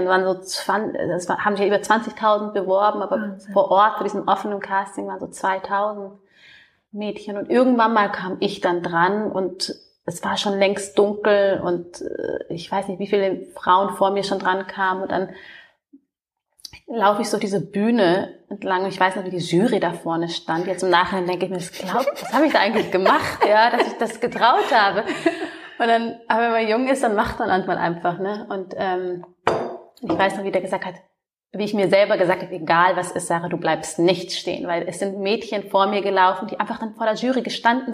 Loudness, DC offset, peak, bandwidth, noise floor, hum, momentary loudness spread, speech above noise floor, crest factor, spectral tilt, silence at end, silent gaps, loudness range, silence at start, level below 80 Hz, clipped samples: -21 LUFS; under 0.1%; -2 dBFS; 15.5 kHz; -79 dBFS; none; 11 LU; 58 dB; 20 dB; -4.5 dB/octave; 0 s; none; 5 LU; 0 s; -58 dBFS; under 0.1%